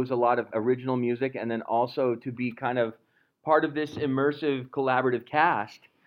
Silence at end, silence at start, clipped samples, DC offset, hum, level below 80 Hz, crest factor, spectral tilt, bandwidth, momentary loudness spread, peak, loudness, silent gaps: 0.3 s; 0 s; under 0.1%; under 0.1%; none; -72 dBFS; 20 dB; -8 dB/octave; 6.6 kHz; 7 LU; -8 dBFS; -27 LUFS; none